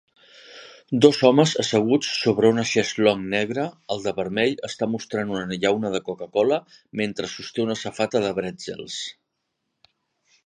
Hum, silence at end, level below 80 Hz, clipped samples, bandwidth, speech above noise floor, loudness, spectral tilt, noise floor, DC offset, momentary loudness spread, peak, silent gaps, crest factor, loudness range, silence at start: none; 1.35 s; -62 dBFS; under 0.1%; 10.5 kHz; 55 dB; -23 LUFS; -5 dB/octave; -78 dBFS; under 0.1%; 14 LU; 0 dBFS; none; 22 dB; 8 LU; 0.5 s